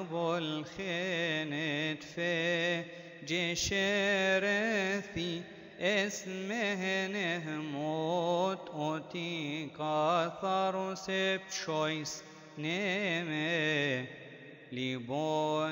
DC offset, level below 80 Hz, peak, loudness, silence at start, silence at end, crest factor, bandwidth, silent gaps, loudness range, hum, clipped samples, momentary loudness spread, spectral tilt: under 0.1%; -66 dBFS; -18 dBFS; -33 LUFS; 0 s; 0 s; 16 dB; 16 kHz; none; 3 LU; none; under 0.1%; 9 LU; -4 dB/octave